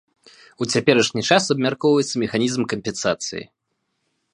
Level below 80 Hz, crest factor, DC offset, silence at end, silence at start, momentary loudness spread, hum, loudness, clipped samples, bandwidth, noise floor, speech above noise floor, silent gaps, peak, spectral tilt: -60 dBFS; 22 dB; under 0.1%; 0.9 s; 0.6 s; 9 LU; none; -20 LUFS; under 0.1%; 11.5 kHz; -74 dBFS; 54 dB; none; 0 dBFS; -4 dB/octave